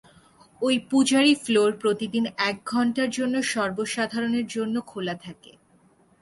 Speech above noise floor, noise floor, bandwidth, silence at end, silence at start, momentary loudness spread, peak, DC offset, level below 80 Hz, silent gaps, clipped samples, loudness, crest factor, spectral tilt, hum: 36 dB; -60 dBFS; 11.5 kHz; 0.9 s; 0.6 s; 10 LU; -8 dBFS; under 0.1%; -66 dBFS; none; under 0.1%; -24 LUFS; 16 dB; -3.5 dB/octave; none